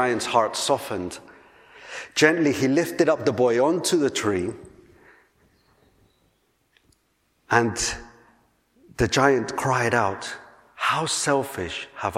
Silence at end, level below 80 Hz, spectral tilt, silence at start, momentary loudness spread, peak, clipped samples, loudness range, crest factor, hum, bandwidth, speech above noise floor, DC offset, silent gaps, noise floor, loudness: 0 s; -52 dBFS; -4 dB/octave; 0 s; 16 LU; -2 dBFS; under 0.1%; 8 LU; 24 dB; none; 16.5 kHz; 46 dB; under 0.1%; none; -68 dBFS; -23 LUFS